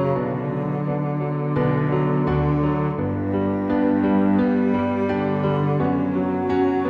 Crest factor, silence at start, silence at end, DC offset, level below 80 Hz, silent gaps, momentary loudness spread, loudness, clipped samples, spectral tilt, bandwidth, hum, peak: 12 dB; 0 s; 0 s; under 0.1%; -42 dBFS; none; 5 LU; -21 LUFS; under 0.1%; -10.5 dB/octave; 5 kHz; none; -8 dBFS